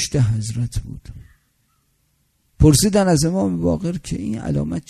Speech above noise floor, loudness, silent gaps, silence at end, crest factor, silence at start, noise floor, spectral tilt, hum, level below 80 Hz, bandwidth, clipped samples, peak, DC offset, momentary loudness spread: 46 dB; -19 LUFS; none; 0.1 s; 20 dB; 0 s; -65 dBFS; -5.5 dB/octave; none; -34 dBFS; 13.5 kHz; under 0.1%; 0 dBFS; under 0.1%; 12 LU